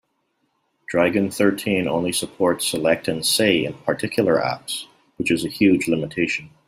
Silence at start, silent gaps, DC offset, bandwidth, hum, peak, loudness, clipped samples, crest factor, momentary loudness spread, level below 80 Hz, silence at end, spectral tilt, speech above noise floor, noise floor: 0.9 s; none; under 0.1%; 16 kHz; none; -4 dBFS; -21 LUFS; under 0.1%; 18 dB; 7 LU; -58 dBFS; 0.2 s; -4 dB/octave; 50 dB; -70 dBFS